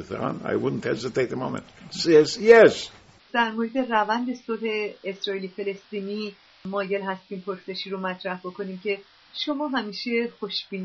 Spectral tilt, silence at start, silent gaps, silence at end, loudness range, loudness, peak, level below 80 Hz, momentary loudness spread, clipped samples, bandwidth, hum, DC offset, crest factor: -3 dB/octave; 0 s; none; 0 s; 11 LU; -24 LUFS; -2 dBFS; -64 dBFS; 15 LU; under 0.1%; 8 kHz; none; under 0.1%; 24 dB